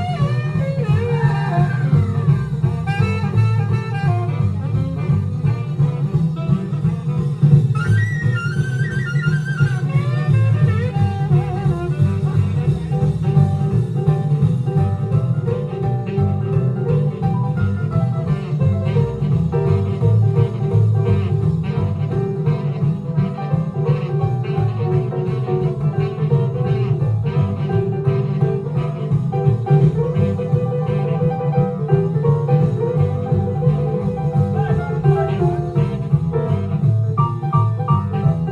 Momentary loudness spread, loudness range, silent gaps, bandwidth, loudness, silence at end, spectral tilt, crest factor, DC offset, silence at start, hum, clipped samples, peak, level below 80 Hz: 4 LU; 2 LU; none; 6.4 kHz; -18 LUFS; 0 s; -9.5 dB/octave; 16 dB; under 0.1%; 0 s; none; under 0.1%; 0 dBFS; -40 dBFS